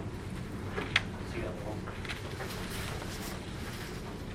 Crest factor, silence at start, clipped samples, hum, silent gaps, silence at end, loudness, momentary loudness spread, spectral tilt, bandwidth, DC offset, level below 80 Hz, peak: 28 dB; 0 s; under 0.1%; none; none; 0 s; -37 LUFS; 9 LU; -4.5 dB/octave; 16.5 kHz; under 0.1%; -46 dBFS; -10 dBFS